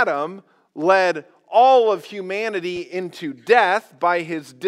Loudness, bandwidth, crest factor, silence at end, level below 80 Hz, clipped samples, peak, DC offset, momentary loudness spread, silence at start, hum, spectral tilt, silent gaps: -19 LUFS; 13.5 kHz; 20 dB; 0 s; -76 dBFS; under 0.1%; 0 dBFS; under 0.1%; 16 LU; 0 s; none; -4.5 dB/octave; none